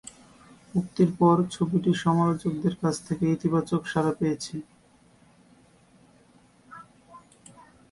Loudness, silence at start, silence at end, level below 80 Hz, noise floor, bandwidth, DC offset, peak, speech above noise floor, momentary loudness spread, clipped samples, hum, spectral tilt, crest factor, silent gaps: -25 LUFS; 0.75 s; 0.75 s; -60 dBFS; -59 dBFS; 11.5 kHz; under 0.1%; -8 dBFS; 34 dB; 16 LU; under 0.1%; none; -7 dB/octave; 20 dB; none